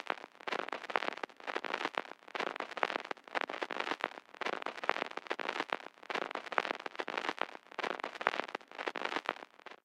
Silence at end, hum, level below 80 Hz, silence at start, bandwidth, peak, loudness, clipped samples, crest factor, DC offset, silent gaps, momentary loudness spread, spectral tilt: 0.1 s; none; -90 dBFS; 0 s; 16 kHz; -8 dBFS; -39 LUFS; under 0.1%; 32 dB; under 0.1%; none; 5 LU; -2.5 dB/octave